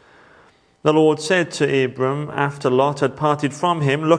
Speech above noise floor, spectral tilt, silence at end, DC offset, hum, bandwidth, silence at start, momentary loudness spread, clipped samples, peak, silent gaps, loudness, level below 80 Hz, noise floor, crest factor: 35 dB; -6 dB/octave; 0 s; under 0.1%; none; 10.5 kHz; 0.85 s; 6 LU; under 0.1%; -2 dBFS; none; -19 LUFS; -62 dBFS; -53 dBFS; 18 dB